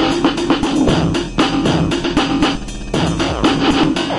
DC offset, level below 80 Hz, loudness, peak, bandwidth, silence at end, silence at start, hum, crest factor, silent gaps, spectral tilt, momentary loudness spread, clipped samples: under 0.1%; -30 dBFS; -16 LUFS; 0 dBFS; 11.5 kHz; 0 s; 0 s; none; 14 dB; none; -5 dB/octave; 4 LU; under 0.1%